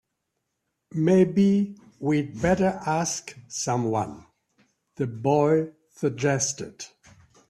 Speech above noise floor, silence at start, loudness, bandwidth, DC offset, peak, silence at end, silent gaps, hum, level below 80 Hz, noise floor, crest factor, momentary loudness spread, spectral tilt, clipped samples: 56 dB; 0.95 s; -25 LUFS; 12 kHz; under 0.1%; -8 dBFS; 0.6 s; none; none; -56 dBFS; -79 dBFS; 18 dB; 15 LU; -5.5 dB/octave; under 0.1%